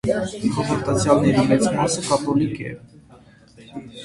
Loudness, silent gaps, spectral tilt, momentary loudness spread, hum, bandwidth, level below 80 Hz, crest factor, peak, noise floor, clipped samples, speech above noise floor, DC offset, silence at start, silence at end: -20 LUFS; none; -5.5 dB/octave; 20 LU; none; 11.5 kHz; -48 dBFS; 20 dB; -2 dBFS; -49 dBFS; under 0.1%; 29 dB; under 0.1%; 0.05 s; 0 s